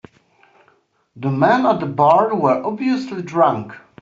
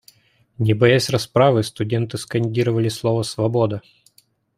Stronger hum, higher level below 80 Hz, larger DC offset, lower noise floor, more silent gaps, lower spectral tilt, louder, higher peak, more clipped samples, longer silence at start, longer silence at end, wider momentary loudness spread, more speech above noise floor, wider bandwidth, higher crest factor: neither; second, -62 dBFS vs -56 dBFS; neither; about the same, -59 dBFS vs -59 dBFS; neither; about the same, -6 dB/octave vs -6 dB/octave; about the same, -17 LUFS vs -19 LUFS; about the same, -2 dBFS vs -2 dBFS; neither; first, 1.15 s vs 0.6 s; second, 0.25 s vs 0.8 s; first, 11 LU vs 8 LU; about the same, 43 dB vs 40 dB; second, 7.6 kHz vs 15.5 kHz; about the same, 16 dB vs 18 dB